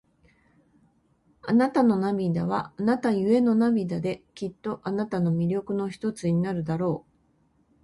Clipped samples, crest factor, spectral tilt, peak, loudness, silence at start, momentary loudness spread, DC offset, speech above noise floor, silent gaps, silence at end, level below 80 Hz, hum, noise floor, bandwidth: under 0.1%; 16 dB; -8 dB/octave; -10 dBFS; -26 LUFS; 1.45 s; 11 LU; under 0.1%; 41 dB; none; 0.85 s; -62 dBFS; none; -66 dBFS; 11.5 kHz